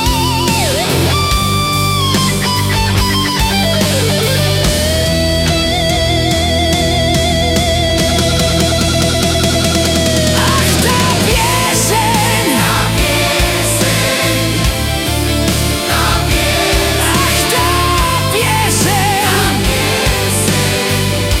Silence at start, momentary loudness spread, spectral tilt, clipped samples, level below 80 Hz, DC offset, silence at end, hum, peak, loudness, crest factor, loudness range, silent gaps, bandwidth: 0 s; 2 LU; -3.5 dB/octave; under 0.1%; -24 dBFS; under 0.1%; 0 s; none; -2 dBFS; -12 LUFS; 12 dB; 1 LU; none; 17.5 kHz